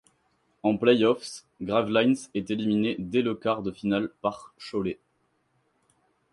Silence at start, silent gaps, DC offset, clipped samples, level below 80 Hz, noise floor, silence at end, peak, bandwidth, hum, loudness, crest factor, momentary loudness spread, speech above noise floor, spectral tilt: 0.65 s; none; under 0.1%; under 0.1%; -62 dBFS; -72 dBFS; 1.4 s; -6 dBFS; 11.5 kHz; none; -26 LUFS; 20 dB; 12 LU; 46 dB; -6 dB/octave